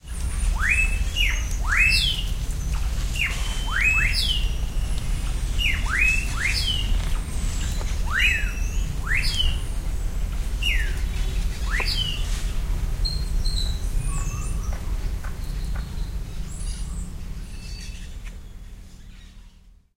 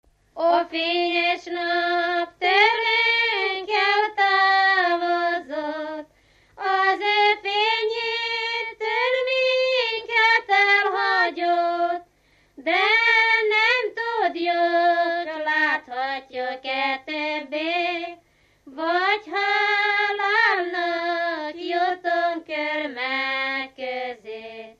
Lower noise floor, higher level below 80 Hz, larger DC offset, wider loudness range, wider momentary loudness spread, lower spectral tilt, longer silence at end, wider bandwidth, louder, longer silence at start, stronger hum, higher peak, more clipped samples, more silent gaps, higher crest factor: second, -50 dBFS vs -61 dBFS; first, -26 dBFS vs -68 dBFS; neither; first, 12 LU vs 6 LU; first, 15 LU vs 12 LU; about the same, -3 dB/octave vs -2 dB/octave; first, 0.25 s vs 0.1 s; first, 16 kHz vs 8.2 kHz; second, -25 LUFS vs -21 LUFS; second, 0.05 s vs 0.35 s; neither; second, -8 dBFS vs -4 dBFS; neither; neither; about the same, 16 dB vs 18 dB